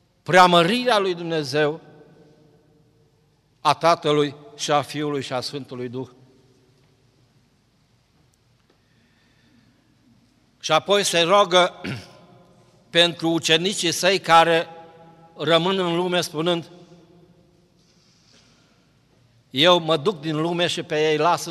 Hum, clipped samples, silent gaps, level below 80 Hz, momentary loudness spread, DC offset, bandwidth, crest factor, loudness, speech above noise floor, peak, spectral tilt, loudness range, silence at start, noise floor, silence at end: none; under 0.1%; none; -68 dBFS; 16 LU; under 0.1%; 16 kHz; 20 dB; -20 LUFS; 42 dB; -2 dBFS; -3.5 dB/octave; 11 LU; 0.3 s; -62 dBFS; 0 s